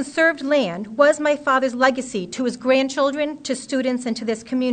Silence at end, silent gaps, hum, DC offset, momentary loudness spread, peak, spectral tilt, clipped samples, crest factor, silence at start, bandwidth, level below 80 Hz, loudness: 0 s; none; none; under 0.1%; 8 LU; -2 dBFS; -4 dB/octave; under 0.1%; 18 dB; 0 s; 9.4 kHz; -64 dBFS; -20 LUFS